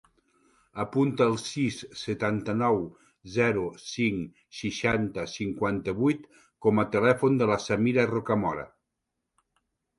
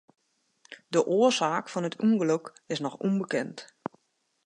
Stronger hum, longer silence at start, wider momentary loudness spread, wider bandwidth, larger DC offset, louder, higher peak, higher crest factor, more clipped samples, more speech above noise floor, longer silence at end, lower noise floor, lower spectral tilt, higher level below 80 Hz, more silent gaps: neither; about the same, 0.75 s vs 0.7 s; second, 12 LU vs 17 LU; about the same, 11.5 kHz vs 10.5 kHz; neither; about the same, -27 LUFS vs -27 LUFS; about the same, -8 dBFS vs -10 dBFS; about the same, 20 dB vs 18 dB; neither; first, 56 dB vs 47 dB; first, 1.3 s vs 0.8 s; first, -83 dBFS vs -74 dBFS; about the same, -6 dB/octave vs -5 dB/octave; first, -58 dBFS vs -80 dBFS; neither